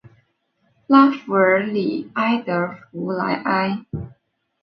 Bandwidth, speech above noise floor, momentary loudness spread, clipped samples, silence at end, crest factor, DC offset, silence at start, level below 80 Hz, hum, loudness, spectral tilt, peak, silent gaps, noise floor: 5.8 kHz; 48 dB; 15 LU; under 0.1%; 0.55 s; 20 dB; under 0.1%; 0.9 s; -54 dBFS; none; -19 LUFS; -8.5 dB/octave; 0 dBFS; none; -66 dBFS